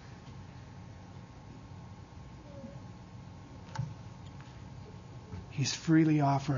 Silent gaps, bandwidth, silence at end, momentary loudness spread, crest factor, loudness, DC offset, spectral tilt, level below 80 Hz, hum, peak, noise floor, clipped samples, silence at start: none; 7.4 kHz; 0 s; 23 LU; 20 dB; -31 LUFS; under 0.1%; -6 dB/octave; -58 dBFS; none; -14 dBFS; -49 dBFS; under 0.1%; 0 s